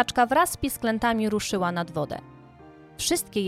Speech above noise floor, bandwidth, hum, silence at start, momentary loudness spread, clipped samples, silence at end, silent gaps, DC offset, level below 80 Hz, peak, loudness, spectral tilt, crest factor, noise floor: 24 dB; 16.5 kHz; none; 0 s; 10 LU; under 0.1%; 0 s; none; under 0.1%; -50 dBFS; -6 dBFS; -25 LUFS; -3.5 dB/octave; 20 dB; -49 dBFS